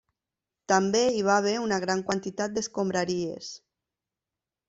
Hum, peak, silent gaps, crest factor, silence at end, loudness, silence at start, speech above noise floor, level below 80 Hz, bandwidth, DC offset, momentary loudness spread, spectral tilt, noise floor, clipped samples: none; -8 dBFS; none; 22 dB; 1.1 s; -27 LUFS; 0.7 s; 63 dB; -66 dBFS; 8.2 kHz; under 0.1%; 11 LU; -4 dB/octave; -89 dBFS; under 0.1%